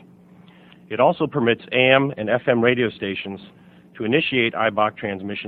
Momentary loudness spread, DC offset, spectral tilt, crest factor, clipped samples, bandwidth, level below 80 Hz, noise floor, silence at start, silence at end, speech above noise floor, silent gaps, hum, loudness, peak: 13 LU; under 0.1%; -8.5 dB/octave; 22 dB; under 0.1%; 4.6 kHz; -62 dBFS; -48 dBFS; 0.9 s; 0 s; 28 dB; none; none; -20 LUFS; 0 dBFS